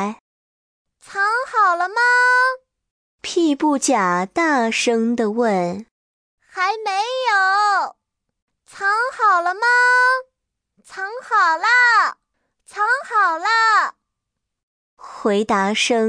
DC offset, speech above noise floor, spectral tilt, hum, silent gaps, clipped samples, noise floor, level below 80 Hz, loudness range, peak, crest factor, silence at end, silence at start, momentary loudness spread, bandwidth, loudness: under 0.1%; 62 dB; -3 dB/octave; none; 0.20-0.85 s, 2.91-3.19 s, 5.91-6.38 s, 8.42-8.48 s, 14.63-14.97 s; under 0.1%; -79 dBFS; -68 dBFS; 4 LU; -6 dBFS; 14 dB; 0 s; 0 s; 13 LU; 10.5 kHz; -17 LUFS